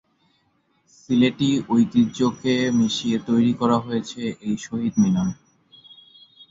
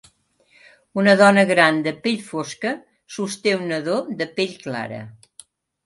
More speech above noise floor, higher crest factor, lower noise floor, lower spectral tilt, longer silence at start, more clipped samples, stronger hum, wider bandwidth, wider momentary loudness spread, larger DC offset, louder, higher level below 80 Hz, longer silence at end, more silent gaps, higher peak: first, 45 dB vs 40 dB; about the same, 16 dB vs 20 dB; first, -66 dBFS vs -59 dBFS; about the same, -6 dB/octave vs -5 dB/octave; first, 1.1 s vs 0.95 s; neither; neither; second, 7.8 kHz vs 11.5 kHz; second, 9 LU vs 18 LU; neither; about the same, -21 LUFS vs -20 LUFS; first, -58 dBFS vs -68 dBFS; second, 0.1 s vs 0.75 s; neither; second, -6 dBFS vs 0 dBFS